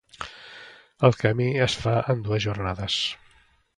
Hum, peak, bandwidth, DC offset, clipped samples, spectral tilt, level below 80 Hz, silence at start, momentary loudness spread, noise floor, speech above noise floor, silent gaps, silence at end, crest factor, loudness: none; -2 dBFS; 11 kHz; under 0.1%; under 0.1%; -5.5 dB/octave; -48 dBFS; 0.2 s; 21 LU; -60 dBFS; 37 dB; none; 0.6 s; 24 dB; -24 LUFS